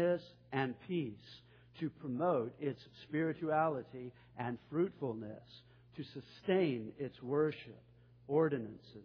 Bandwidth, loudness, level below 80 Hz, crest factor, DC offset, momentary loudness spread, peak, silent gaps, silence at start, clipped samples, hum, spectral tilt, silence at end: 5.4 kHz; -38 LUFS; -74 dBFS; 18 dB; under 0.1%; 17 LU; -20 dBFS; none; 0 s; under 0.1%; 60 Hz at -65 dBFS; -6 dB/octave; 0 s